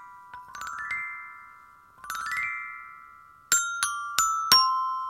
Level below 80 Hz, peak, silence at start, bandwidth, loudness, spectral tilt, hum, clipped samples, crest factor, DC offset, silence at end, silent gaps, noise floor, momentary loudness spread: -66 dBFS; 0 dBFS; 0 s; 16.5 kHz; -25 LUFS; 2 dB/octave; none; under 0.1%; 30 dB; under 0.1%; 0 s; none; -53 dBFS; 26 LU